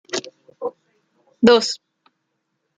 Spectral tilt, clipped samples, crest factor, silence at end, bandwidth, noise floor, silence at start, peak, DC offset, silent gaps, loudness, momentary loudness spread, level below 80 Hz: -4 dB/octave; under 0.1%; 22 dB; 1 s; 9.4 kHz; -74 dBFS; 0.1 s; -2 dBFS; under 0.1%; none; -17 LUFS; 17 LU; -62 dBFS